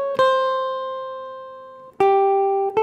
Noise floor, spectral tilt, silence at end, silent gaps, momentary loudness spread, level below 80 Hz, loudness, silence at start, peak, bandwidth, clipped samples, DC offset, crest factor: -40 dBFS; -5 dB/octave; 0 s; none; 19 LU; -68 dBFS; -20 LUFS; 0 s; -6 dBFS; 9 kHz; under 0.1%; under 0.1%; 14 dB